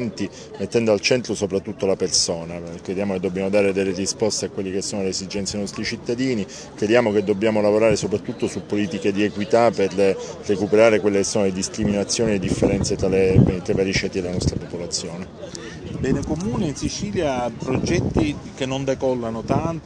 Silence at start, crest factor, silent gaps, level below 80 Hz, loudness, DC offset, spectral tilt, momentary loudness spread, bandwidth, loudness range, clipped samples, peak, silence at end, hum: 0 s; 20 dB; none; -42 dBFS; -21 LUFS; under 0.1%; -5 dB/octave; 10 LU; 10 kHz; 5 LU; under 0.1%; -2 dBFS; 0 s; none